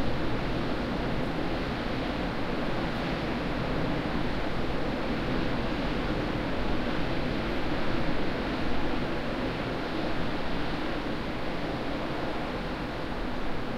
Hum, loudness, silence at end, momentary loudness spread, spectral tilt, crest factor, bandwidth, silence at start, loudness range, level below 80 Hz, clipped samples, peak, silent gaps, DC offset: none; -31 LUFS; 0 s; 3 LU; -6.5 dB/octave; 14 dB; 11 kHz; 0 s; 2 LU; -38 dBFS; under 0.1%; -14 dBFS; none; under 0.1%